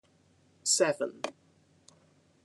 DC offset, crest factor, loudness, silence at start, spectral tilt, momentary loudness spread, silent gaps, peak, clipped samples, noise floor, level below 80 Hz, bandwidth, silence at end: under 0.1%; 24 dB; -30 LUFS; 0.65 s; -1.5 dB/octave; 15 LU; none; -12 dBFS; under 0.1%; -66 dBFS; -86 dBFS; 12 kHz; 1.15 s